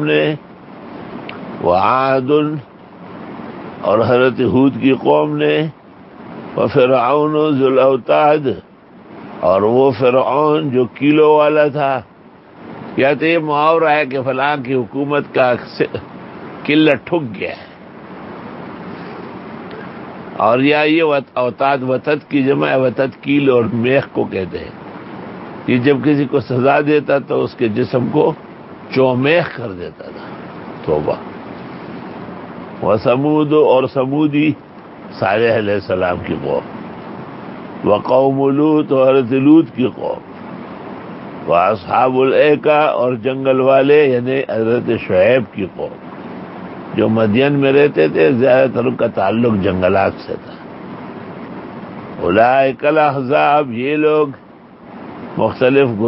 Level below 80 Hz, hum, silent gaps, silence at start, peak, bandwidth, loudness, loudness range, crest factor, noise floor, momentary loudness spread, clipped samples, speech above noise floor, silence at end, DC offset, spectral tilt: -48 dBFS; none; none; 0 s; 0 dBFS; 5.8 kHz; -14 LUFS; 6 LU; 16 dB; -41 dBFS; 19 LU; under 0.1%; 28 dB; 0 s; under 0.1%; -10.5 dB/octave